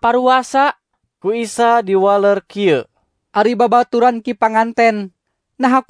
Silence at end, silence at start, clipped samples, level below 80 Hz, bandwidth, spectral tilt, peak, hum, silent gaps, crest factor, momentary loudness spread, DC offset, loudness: 0.1 s; 0 s; under 0.1%; -60 dBFS; 11 kHz; -5 dB/octave; 0 dBFS; none; none; 14 dB; 8 LU; under 0.1%; -15 LUFS